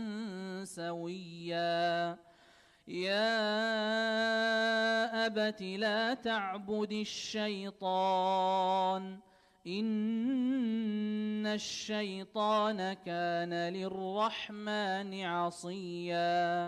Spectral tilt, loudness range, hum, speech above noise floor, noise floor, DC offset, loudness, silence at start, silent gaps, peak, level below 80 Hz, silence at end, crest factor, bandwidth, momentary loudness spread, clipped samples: -4.5 dB/octave; 4 LU; none; 30 dB; -63 dBFS; under 0.1%; -34 LUFS; 0 s; none; -20 dBFS; -78 dBFS; 0 s; 14 dB; 12.5 kHz; 10 LU; under 0.1%